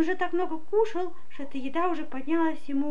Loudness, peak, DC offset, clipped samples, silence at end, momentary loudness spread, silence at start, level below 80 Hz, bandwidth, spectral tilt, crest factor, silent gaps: -29 LUFS; -14 dBFS; 4%; under 0.1%; 0 s; 10 LU; 0 s; -70 dBFS; 7.8 kHz; -6 dB/octave; 14 dB; none